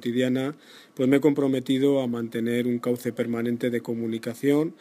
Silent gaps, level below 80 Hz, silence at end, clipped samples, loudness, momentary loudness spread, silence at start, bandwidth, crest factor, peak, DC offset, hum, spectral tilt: none; -72 dBFS; 0.05 s; under 0.1%; -25 LUFS; 8 LU; 0 s; 15.5 kHz; 18 dB; -8 dBFS; under 0.1%; none; -6.5 dB/octave